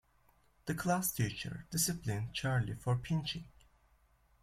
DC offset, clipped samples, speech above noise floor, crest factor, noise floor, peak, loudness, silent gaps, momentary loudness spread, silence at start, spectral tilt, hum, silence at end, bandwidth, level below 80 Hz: under 0.1%; under 0.1%; 34 dB; 18 dB; -69 dBFS; -20 dBFS; -36 LUFS; none; 9 LU; 0.65 s; -4.5 dB/octave; none; 0.95 s; 16.5 kHz; -60 dBFS